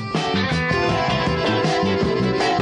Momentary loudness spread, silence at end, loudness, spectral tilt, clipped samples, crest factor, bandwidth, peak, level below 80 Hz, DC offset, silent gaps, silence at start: 1 LU; 0 s; -20 LUFS; -5.5 dB/octave; under 0.1%; 14 dB; 10.5 kHz; -6 dBFS; -38 dBFS; under 0.1%; none; 0 s